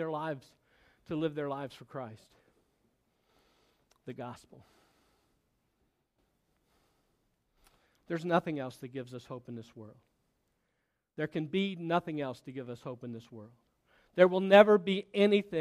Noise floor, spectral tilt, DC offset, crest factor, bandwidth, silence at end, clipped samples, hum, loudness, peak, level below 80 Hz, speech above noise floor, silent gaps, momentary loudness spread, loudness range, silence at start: -81 dBFS; -7 dB/octave; under 0.1%; 28 dB; 13 kHz; 0 s; under 0.1%; none; -30 LUFS; -6 dBFS; -76 dBFS; 50 dB; none; 22 LU; 24 LU; 0 s